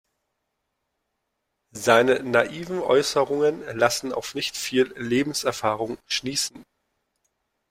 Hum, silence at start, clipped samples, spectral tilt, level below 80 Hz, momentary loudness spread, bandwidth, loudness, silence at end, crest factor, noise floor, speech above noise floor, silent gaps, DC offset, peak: none; 1.75 s; under 0.1%; -3.5 dB/octave; -62 dBFS; 9 LU; 16 kHz; -23 LUFS; 1.1 s; 22 dB; -78 dBFS; 55 dB; none; under 0.1%; -2 dBFS